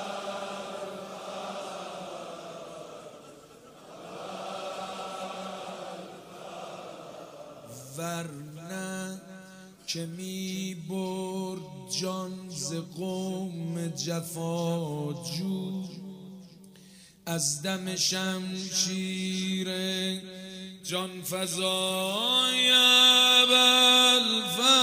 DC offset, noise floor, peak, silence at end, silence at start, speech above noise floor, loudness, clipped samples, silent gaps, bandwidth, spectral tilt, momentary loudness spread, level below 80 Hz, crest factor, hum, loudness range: under 0.1%; -53 dBFS; -8 dBFS; 0 s; 0 s; 25 dB; -26 LUFS; under 0.1%; none; 16 kHz; -2.5 dB/octave; 25 LU; -74 dBFS; 20 dB; none; 19 LU